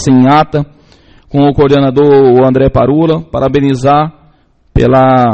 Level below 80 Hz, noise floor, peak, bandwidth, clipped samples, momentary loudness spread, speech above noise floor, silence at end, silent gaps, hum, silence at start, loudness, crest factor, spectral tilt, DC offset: -28 dBFS; -47 dBFS; 0 dBFS; 8.6 kHz; 0.3%; 10 LU; 40 dB; 0 s; none; none; 0 s; -9 LUFS; 8 dB; -7.5 dB/octave; under 0.1%